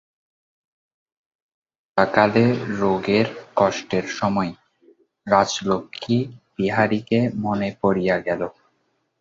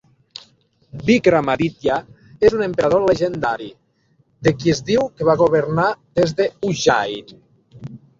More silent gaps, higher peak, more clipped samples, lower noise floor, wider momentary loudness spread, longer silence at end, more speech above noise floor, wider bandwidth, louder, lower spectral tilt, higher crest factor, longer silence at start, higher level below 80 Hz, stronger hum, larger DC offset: neither; about the same, -2 dBFS vs -2 dBFS; neither; first, -69 dBFS vs -60 dBFS; second, 8 LU vs 22 LU; first, 0.7 s vs 0.2 s; first, 49 dB vs 43 dB; about the same, 7.8 kHz vs 7.8 kHz; second, -21 LUFS vs -18 LUFS; about the same, -6 dB/octave vs -5.5 dB/octave; about the same, 20 dB vs 18 dB; first, 1.95 s vs 0.95 s; second, -56 dBFS vs -50 dBFS; neither; neither